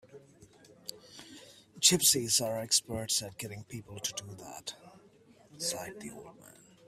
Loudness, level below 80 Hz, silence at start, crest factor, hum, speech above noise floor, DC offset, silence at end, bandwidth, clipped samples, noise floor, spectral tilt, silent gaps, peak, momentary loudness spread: -29 LUFS; -68 dBFS; 0.1 s; 26 dB; none; 27 dB; under 0.1%; 0.35 s; 16 kHz; under 0.1%; -61 dBFS; -1.5 dB/octave; none; -8 dBFS; 25 LU